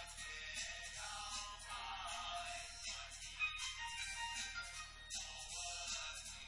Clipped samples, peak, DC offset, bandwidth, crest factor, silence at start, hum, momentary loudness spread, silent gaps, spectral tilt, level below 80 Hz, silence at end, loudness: under 0.1%; -28 dBFS; under 0.1%; 11.5 kHz; 18 dB; 0 s; none; 6 LU; none; 0.5 dB/octave; -62 dBFS; 0 s; -45 LUFS